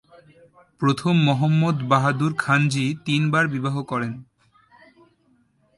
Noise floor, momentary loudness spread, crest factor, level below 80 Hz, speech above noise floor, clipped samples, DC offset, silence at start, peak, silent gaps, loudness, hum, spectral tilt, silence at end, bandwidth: -62 dBFS; 8 LU; 18 dB; -62 dBFS; 42 dB; under 0.1%; under 0.1%; 0.8 s; -4 dBFS; none; -21 LUFS; none; -6.5 dB/octave; 1.55 s; 11.5 kHz